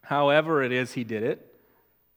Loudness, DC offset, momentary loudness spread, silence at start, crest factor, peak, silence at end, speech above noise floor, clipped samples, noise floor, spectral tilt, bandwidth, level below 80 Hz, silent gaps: -25 LUFS; under 0.1%; 10 LU; 0.05 s; 20 dB; -6 dBFS; 0.8 s; 40 dB; under 0.1%; -65 dBFS; -6 dB/octave; 16.5 kHz; -78 dBFS; none